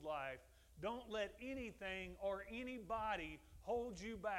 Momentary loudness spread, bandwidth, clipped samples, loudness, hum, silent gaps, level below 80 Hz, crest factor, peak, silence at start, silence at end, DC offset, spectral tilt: 6 LU; 16 kHz; under 0.1%; -47 LUFS; none; none; -64 dBFS; 16 dB; -30 dBFS; 0 s; 0 s; under 0.1%; -5 dB/octave